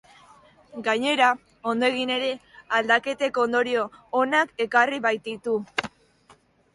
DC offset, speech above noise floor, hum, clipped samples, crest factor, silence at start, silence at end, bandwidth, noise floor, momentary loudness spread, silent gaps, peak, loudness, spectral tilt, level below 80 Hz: under 0.1%; 34 dB; none; under 0.1%; 20 dB; 0.75 s; 0.85 s; 11.5 kHz; -58 dBFS; 9 LU; none; -6 dBFS; -24 LUFS; -3 dB/octave; -68 dBFS